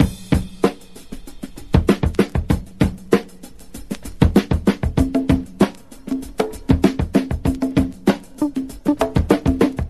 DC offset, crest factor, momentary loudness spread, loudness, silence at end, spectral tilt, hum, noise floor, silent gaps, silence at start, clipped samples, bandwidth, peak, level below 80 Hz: 0.8%; 18 dB; 19 LU; -20 LUFS; 0 s; -7 dB/octave; none; -41 dBFS; none; 0 s; under 0.1%; 13 kHz; 0 dBFS; -28 dBFS